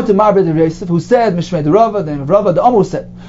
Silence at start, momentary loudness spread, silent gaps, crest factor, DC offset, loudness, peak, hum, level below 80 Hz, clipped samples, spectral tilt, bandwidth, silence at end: 0 s; 6 LU; none; 12 dB; under 0.1%; -12 LUFS; 0 dBFS; none; -40 dBFS; under 0.1%; -8 dB/octave; 7.8 kHz; 0 s